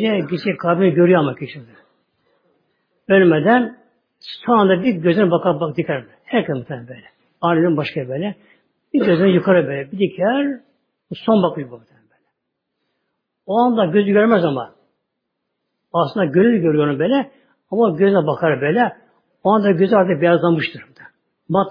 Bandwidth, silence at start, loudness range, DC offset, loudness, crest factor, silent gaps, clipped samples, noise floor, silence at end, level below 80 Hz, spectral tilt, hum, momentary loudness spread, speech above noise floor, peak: 5.2 kHz; 0 s; 5 LU; under 0.1%; -17 LUFS; 16 dB; none; under 0.1%; -76 dBFS; 0 s; -64 dBFS; -10 dB/octave; none; 13 LU; 60 dB; 0 dBFS